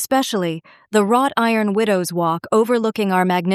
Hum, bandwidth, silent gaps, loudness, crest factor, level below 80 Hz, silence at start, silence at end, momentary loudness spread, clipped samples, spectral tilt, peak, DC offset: none; 15 kHz; none; -18 LUFS; 16 dB; -68 dBFS; 0 s; 0 s; 5 LU; under 0.1%; -5 dB/octave; -2 dBFS; under 0.1%